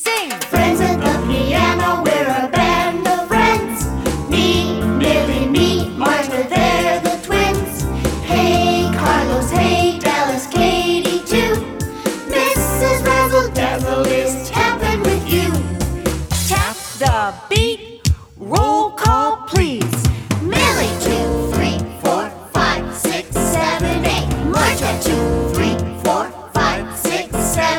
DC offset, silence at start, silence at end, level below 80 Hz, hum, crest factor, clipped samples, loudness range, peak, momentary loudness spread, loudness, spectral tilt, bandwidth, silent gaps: under 0.1%; 0 s; 0 s; -28 dBFS; none; 16 dB; under 0.1%; 2 LU; 0 dBFS; 6 LU; -17 LUFS; -4.5 dB/octave; over 20 kHz; none